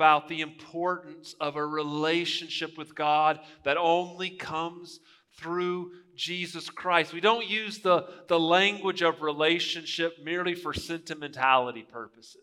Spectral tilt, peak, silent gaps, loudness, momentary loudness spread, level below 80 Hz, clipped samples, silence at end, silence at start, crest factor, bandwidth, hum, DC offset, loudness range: -4 dB/octave; -6 dBFS; none; -28 LUFS; 13 LU; -66 dBFS; under 0.1%; 0.15 s; 0 s; 22 dB; 14.5 kHz; none; under 0.1%; 5 LU